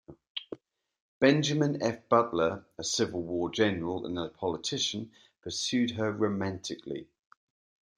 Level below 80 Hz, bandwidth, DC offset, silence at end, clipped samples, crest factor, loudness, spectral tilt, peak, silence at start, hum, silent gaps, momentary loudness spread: -68 dBFS; 10.5 kHz; under 0.1%; 0.95 s; under 0.1%; 22 dB; -30 LUFS; -4.5 dB/octave; -8 dBFS; 0.1 s; none; 0.30-0.35 s, 1.00-1.21 s; 15 LU